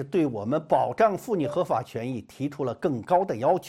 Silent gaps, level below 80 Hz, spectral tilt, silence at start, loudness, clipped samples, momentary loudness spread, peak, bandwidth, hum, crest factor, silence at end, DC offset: none; -64 dBFS; -7.5 dB/octave; 0 s; -26 LUFS; under 0.1%; 9 LU; -8 dBFS; 16 kHz; none; 18 dB; 0 s; under 0.1%